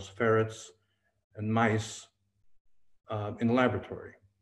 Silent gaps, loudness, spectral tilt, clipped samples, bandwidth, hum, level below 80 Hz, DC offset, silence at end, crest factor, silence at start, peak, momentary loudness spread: 1.24-1.30 s, 2.60-2.65 s; -30 LUFS; -6 dB/octave; under 0.1%; 11.5 kHz; none; -66 dBFS; under 0.1%; 0.3 s; 20 dB; 0 s; -12 dBFS; 19 LU